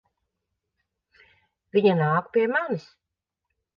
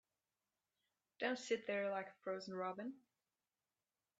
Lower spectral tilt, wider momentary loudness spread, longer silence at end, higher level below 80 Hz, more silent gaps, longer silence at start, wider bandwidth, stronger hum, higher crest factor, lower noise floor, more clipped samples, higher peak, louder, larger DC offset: first, -8.5 dB/octave vs -4 dB/octave; about the same, 9 LU vs 10 LU; second, 0.95 s vs 1.2 s; first, -74 dBFS vs under -90 dBFS; neither; first, 1.75 s vs 1.2 s; second, 6.6 kHz vs 8.8 kHz; neither; about the same, 20 dB vs 20 dB; second, -83 dBFS vs under -90 dBFS; neither; first, -6 dBFS vs -26 dBFS; first, -23 LUFS vs -44 LUFS; neither